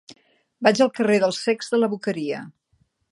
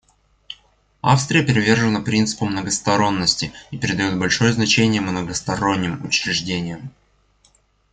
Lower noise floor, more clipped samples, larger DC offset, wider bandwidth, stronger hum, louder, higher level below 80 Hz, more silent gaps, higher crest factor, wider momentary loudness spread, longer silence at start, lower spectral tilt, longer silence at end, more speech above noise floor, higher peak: first, -66 dBFS vs -59 dBFS; neither; neither; first, 11.5 kHz vs 9.4 kHz; second, none vs 50 Hz at -45 dBFS; about the same, -21 LUFS vs -19 LUFS; second, -72 dBFS vs -50 dBFS; neither; about the same, 22 dB vs 20 dB; second, 10 LU vs 13 LU; second, 0.1 s vs 0.5 s; about the same, -4.5 dB/octave vs -4 dB/octave; second, 0.6 s vs 1.05 s; first, 45 dB vs 40 dB; about the same, -2 dBFS vs -2 dBFS